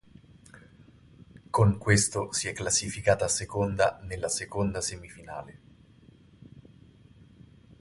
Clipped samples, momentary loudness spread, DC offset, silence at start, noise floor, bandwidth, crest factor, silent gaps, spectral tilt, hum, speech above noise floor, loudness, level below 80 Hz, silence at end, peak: under 0.1%; 18 LU; under 0.1%; 0.55 s; -56 dBFS; 11.5 kHz; 24 dB; none; -4 dB/octave; none; 28 dB; -27 LUFS; -50 dBFS; 1.2 s; -6 dBFS